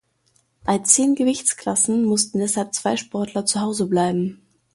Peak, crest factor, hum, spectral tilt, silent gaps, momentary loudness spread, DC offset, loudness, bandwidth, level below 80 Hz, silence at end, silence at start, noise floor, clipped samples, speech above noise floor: 0 dBFS; 22 dB; none; -3.5 dB/octave; none; 9 LU; under 0.1%; -20 LUFS; 11.5 kHz; -60 dBFS; 0.4 s; 0.65 s; -64 dBFS; under 0.1%; 44 dB